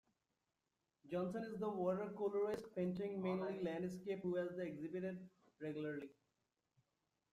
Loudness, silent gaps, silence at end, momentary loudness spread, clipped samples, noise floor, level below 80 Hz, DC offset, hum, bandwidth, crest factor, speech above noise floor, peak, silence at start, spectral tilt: -44 LUFS; none; 1.2 s; 8 LU; under 0.1%; -90 dBFS; -82 dBFS; under 0.1%; none; 12 kHz; 16 dB; 47 dB; -28 dBFS; 1.05 s; -8 dB/octave